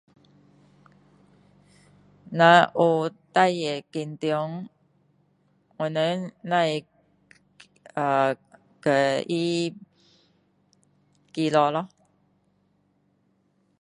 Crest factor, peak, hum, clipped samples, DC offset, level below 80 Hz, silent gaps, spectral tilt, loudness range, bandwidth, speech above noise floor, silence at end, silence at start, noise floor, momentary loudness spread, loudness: 24 dB; -2 dBFS; none; under 0.1%; under 0.1%; -74 dBFS; none; -5.5 dB/octave; 7 LU; 11 kHz; 45 dB; 1.95 s; 2.25 s; -68 dBFS; 16 LU; -24 LUFS